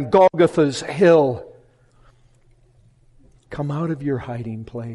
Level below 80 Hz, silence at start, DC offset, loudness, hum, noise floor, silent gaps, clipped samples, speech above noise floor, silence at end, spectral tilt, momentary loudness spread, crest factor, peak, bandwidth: -54 dBFS; 0 s; under 0.1%; -19 LUFS; none; -55 dBFS; none; under 0.1%; 36 dB; 0 s; -6.5 dB/octave; 17 LU; 16 dB; -4 dBFS; 11.5 kHz